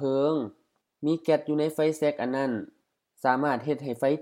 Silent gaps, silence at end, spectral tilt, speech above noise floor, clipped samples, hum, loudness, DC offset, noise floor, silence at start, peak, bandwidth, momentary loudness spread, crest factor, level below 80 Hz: none; 0 s; -6.5 dB/octave; 42 dB; under 0.1%; none; -27 LUFS; under 0.1%; -68 dBFS; 0 s; -8 dBFS; 16 kHz; 7 LU; 20 dB; -80 dBFS